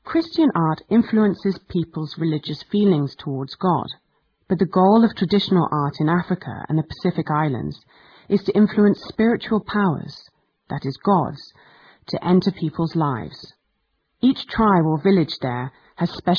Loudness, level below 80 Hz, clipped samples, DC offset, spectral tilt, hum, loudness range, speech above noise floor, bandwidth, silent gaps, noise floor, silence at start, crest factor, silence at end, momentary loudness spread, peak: -21 LUFS; -52 dBFS; under 0.1%; under 0.1%; -9 dB/octave; none; 4 LU; 51 dB; 5.4 kHz; none; -71 dBFS; 0.05 s; 16 dB; 0 s; 12 LU; -4 dBFS